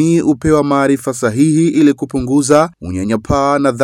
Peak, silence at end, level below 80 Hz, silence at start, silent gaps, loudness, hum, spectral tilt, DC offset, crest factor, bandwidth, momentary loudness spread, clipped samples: 0 dBFS; 0 s; -38 dBFS; 0 s; none; -13 LUFS; none; -6 dB/octave; under 0.1%; 12 dB; 13 kHz; 7 LU; under 0.1%